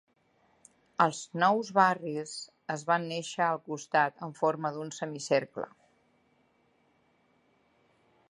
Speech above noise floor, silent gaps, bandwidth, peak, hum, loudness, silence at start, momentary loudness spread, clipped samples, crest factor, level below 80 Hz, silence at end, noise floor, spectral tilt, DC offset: 40 dB; none; 11.5 kHz; -8 dBFS; none; -30 LUFS; 1 s; 15 LU; under 0.1%; 24 dB; -82 dBFS; 2.65 s; -69 dBFS; -4.5 dB/octave; under 0.1%